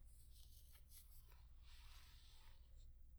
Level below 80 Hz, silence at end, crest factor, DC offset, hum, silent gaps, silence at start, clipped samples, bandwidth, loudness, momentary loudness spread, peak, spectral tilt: -64 dBFS; 0 s; 12 dB; under 0.1%; none; none; 0 s; under 0.1%; over 20 kHz; -66 LUFS; 3 LU; -50 dBFS; -2.5 dB/octave